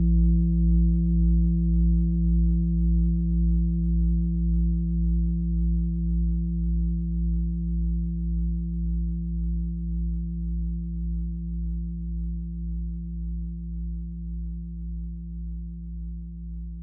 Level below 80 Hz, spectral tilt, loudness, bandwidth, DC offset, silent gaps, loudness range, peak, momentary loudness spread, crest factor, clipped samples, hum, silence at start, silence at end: -26 dBFS; -17 dB/octave; -27 LUFS; 0.6 kHz; under 0.1%; none; 11 LU; -12 dBFS; 13 LU; 12 dB; under 0.1%; none; 0 s; 0 s